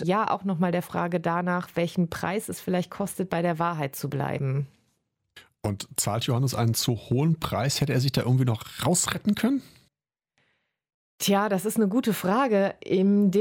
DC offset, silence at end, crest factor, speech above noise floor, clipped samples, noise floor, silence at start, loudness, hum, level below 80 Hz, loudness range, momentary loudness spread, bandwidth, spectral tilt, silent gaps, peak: under 0.1%; 0 s; 16 dB; 55 dB; under 0.1%; -80 dBFS; 0 s; -26 LUFS; none; -58 dBFS; 4 LU; 7 LU; 17 kHz; -5.5 dB/octave; 10.94-11.18 s; -10 dBFS